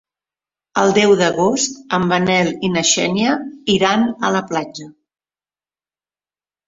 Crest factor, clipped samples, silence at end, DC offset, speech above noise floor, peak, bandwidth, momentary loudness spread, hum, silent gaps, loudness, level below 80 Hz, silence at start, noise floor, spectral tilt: 18 dB; under 0.1%; 1.75 s; under 0.1%; over 74 dB; -2 dBFS; 7.8 kHz; 9 LU; none; none; -16 LUFS; -56 dBFS; 0.75 s; under -90 dBFS; -3.5 dB/octave